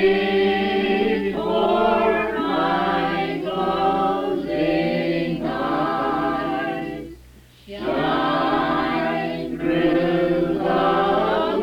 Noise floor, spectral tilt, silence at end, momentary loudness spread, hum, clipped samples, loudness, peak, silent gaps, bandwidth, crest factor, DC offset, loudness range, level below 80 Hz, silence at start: -47 dBFS; -7 dB/octave; 0 s; 6 LU; none; under 0.1%; -21 LUFS; -8 dBFS; none; 14.5 kHz; 14 dB; under 0.1%; 3 LU; -46 dBFS; 0 s